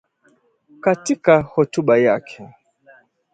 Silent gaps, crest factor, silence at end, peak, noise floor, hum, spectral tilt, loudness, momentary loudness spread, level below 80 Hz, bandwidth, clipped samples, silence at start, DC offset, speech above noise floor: none; 20 dB; 0.9 s; 0 dBFS; -60 dBFS; none; -6 dB/octave; -17 LUFS; 12 LU; -56 dBFS; 9.2 kHz; under 0.1%; 0.85 s; under 0.1%; 43 dB